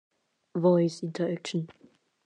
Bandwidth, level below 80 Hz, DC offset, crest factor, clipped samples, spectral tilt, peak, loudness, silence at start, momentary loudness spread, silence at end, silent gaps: 9.6 kHz; -82 dBFS; under 0.1%; 16 dB; under 0.1%; -7 dB/octave; -12 dBFS; -28 LUFS; 0.55 s; 13 LU; 0.6 s; none